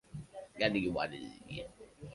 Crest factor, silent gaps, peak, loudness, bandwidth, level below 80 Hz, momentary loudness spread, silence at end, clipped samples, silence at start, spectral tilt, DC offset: 22 dB; none; -16 dBFS; -36 LUFS; 11.5 kHz; -60 dBFS; 18 LU; 0 s; under 0.1%; 0.1 s; -6 dB/octave; under 0.1%